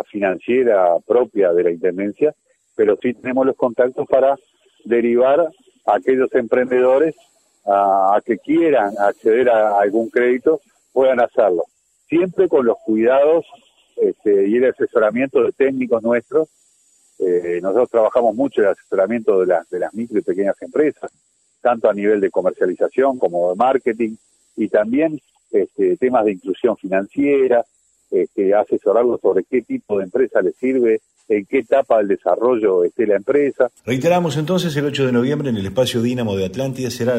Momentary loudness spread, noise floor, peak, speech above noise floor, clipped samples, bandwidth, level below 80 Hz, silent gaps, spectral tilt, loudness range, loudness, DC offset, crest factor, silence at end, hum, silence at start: 7 LU; -57 dBFS; -4 dBFS; 40 dB; under 0.1%; 15 kHz; -60 dBFS; none; -6.5 dB/octave; 3 LU; -17 LUFS; under 0.1%; 14 dB; 0 s; none; 0.15 s